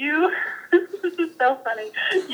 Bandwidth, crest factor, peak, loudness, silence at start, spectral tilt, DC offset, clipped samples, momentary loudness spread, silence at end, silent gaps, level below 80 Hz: 19.5 kHz; 16 dB; -6 dBFS; -23 LUFS; 0 s; -3 dB/octave; under 0.1%; under 0.1%; 6 LU; 0 s; none; -86 dBFS